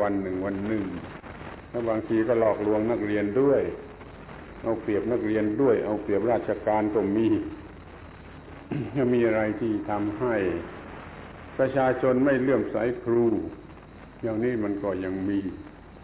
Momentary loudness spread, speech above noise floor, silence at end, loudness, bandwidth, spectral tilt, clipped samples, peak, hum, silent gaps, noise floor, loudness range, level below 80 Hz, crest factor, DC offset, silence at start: 20 LU; 20 dB; 0 s; -26 LUFS; 4 kHz; -11.5 dB/octave; under 0.1%; -12 dBFS; none; none; -45 dBFS; 2 LU; -50 dBFS; 16 dB; under 0.1%; 0 s